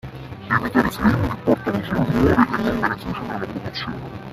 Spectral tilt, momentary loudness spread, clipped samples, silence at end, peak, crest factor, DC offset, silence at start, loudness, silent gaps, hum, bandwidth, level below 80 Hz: -7 dB/octave; 11 LU; under 0.1%; 0 s; 0 dBFS; 20 dB; under 0.1%; 0.05 s; -21 LUFS; none; none; 15 kHz; -40 dBFS